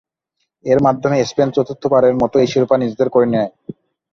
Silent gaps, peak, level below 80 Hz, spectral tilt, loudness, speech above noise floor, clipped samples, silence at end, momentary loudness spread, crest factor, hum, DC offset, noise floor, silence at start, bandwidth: none; -2 dBFS; -50 dBFS; -6.5 dB/octave; -15 LUFS; 58 dB; under 0.1%; 0.4 s; 10 LU; 14 dB; none; under 0.1%; -72 dBFS; 0.65 s; 7.2 kHz